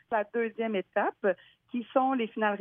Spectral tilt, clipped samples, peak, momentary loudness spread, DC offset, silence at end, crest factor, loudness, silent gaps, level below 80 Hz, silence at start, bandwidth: -9 dB/octave; under 0.1%; -12 dBFS; 9 LU; under 0.1%; 0 s; 18 dB; -30 LUFS; none; -82 dBFS; 0.1 s; 3.7 kHz